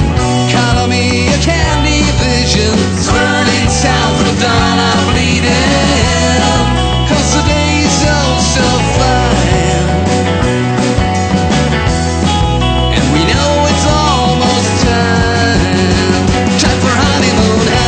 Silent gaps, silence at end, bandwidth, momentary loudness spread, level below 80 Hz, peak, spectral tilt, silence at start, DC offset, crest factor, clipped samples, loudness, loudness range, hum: none; 0 s; 9.2 kHz; 2 LU; -20 dBFS; 0 dBFS; -4.5 dB/octave; 0 s; under 0.1%; 10 dB; under 0.1%; -11 LUFS; 1 LU; none